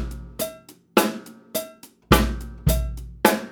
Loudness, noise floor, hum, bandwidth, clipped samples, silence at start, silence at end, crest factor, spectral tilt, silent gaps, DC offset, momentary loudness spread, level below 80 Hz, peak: -24 LUFS; -43 dBFS; none; over 20 kHz; under 0.1%; 0 s; 0 s; 24 dB; -4.5 dB/octave; none; under 0.1%; 14 LU; -30 dBFS; 0 dBFS